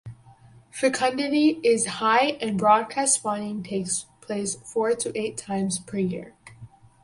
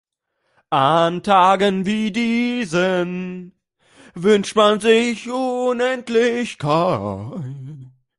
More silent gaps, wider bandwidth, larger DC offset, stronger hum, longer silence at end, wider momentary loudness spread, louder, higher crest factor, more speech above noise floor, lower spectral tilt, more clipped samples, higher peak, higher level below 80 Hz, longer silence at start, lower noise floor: neither; about the same, 11.5 kHz vs 11.5 kHz; neither; neither; about the same, 0.35 s vs 0.3 s; second, 10 LU vs 15 LU; second, -24 LUFS vs -18 LUFS; about the same, 18 dB vs 18 dB; second, 28 dB vs 53 dB; second, -3.5 dB/octave vs -5.5 dB/octave; neither; second, -6 dBFS vs -2 dBFS; second, -62 dBFS vs -56 dBFS; second, 0.05 s vs 0.7 s; second, -52 dBFS vs -71 dBFS